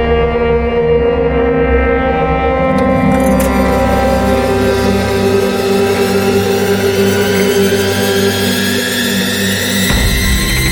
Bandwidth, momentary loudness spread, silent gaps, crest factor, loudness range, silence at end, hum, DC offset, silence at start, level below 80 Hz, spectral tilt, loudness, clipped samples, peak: 17 kHz; 2 LU; none; 12 dB; 0 LU; 0 s; none; under 0.1%; 0 s; -22 dBFS; -4.5 dB/octave; -12 LUFS; under 0.1%; 0 dBFS